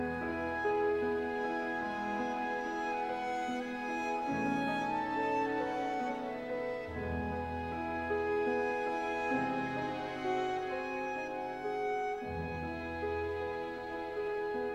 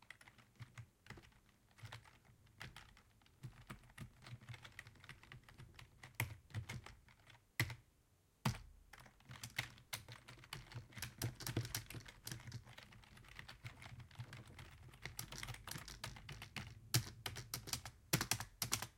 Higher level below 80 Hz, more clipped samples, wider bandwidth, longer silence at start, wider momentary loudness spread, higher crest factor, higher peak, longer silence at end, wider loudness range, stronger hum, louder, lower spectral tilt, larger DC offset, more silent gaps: first, -58 dBFS vs -66 dBFS; neither; second, 12.5 kHz vs 16.5 kHz; about the same, 0 s vs 0 s; second, 6 LU vs 19 LU; second, 14 dB vs 34 dB; second, -22 dBFS vs -16 dBFS; about the same, 0 s vs 0.05 s; second, 3 LU vs 12 LU; neither; first, -36 LUFS vs -48 LUFS; first, -6 dB/octave vs -3 dB/octave; neither; neither